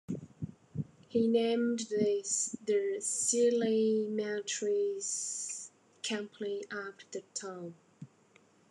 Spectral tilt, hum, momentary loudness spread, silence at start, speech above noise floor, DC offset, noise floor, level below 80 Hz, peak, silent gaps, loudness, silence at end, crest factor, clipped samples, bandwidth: -3.5 dB/octave; none; 15 LU; 0.1 s; 33 dB; under 0.1%; -65 dBFS; -74 dBFS; -16 dBFS; none; -33 LUFS; 0.65 s; 18 dB; under 0.1%; 12 kHz